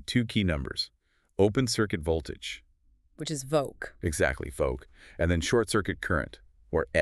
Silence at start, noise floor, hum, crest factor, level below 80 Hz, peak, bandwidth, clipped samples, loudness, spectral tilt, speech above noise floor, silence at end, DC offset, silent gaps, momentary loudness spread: 0 s; -64 dBFS; none; 20 dB; -44 dBFS; -10 dBFS; 13.5 kHz; under 0.1%; -29 LUFS; -5 dB/octave; 36 dB; 0 s; under 0.1%; none; 13 LU